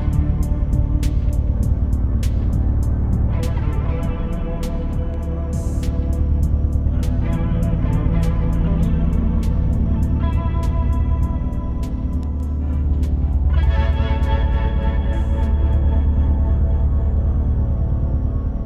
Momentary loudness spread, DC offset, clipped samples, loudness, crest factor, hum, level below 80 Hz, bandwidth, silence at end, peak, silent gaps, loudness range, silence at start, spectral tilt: 5 LU; under 0.1%; under 0.1%; -20 LUFS; 12 dB; none; -18 dBFS; 8.2 kHz; 0 s; -6 dBFS; none; 3 LU; 0 s; -8.5 dB/octave